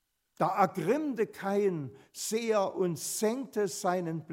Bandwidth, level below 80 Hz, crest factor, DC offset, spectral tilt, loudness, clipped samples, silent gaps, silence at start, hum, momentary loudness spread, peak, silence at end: 16 kHz; -80 dBFS; 20 dB; under 0.1%; -5 dB/octave; -31 LUFS; under 0.1%; none; 0.4 s; none; 6 LU; -10 dBFS; 0 s